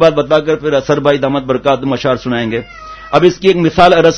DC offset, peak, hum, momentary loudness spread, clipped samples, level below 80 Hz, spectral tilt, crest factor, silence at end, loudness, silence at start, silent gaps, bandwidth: under 0.1%; 0 dBFS; none; 9 LU; 0.6%; -40 dBFS; -6 dB/octave; 12 dB; 0 s; -12 LUFS; 0 s; none; 9.2 kHz